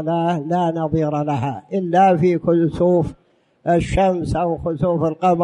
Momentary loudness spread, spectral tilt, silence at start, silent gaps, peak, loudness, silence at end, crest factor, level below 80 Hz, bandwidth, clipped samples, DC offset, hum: 7 LU; -8 dB/octave; 0 s; none; -4 dBFS; -19 LUFS; 0 s; 14 dB; -38 dBFS; 11 kHz; under 0.1%; under 0.1%; none